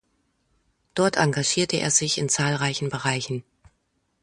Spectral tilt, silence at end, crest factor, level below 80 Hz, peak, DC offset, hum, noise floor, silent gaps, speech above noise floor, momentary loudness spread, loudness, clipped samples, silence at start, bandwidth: -3 dB/octave; 0.8 s; 20 dB; -60 dBFS; -6 dBFS; under 0.1%; none; -72 dBFS; none; 48 dB; 9 LU; -23 LUFS; under 0.1%; 0.95 s; 11.5 kHz